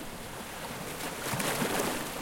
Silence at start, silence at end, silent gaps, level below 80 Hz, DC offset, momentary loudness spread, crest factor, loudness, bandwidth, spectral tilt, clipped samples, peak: 0 s; 0 s; none; -54 dBFS; under 0.1%; 10 LU; 22 dB; -33 LUFS; 17 kHz; -3 dB/octave; under 0.1%; -12 dBFS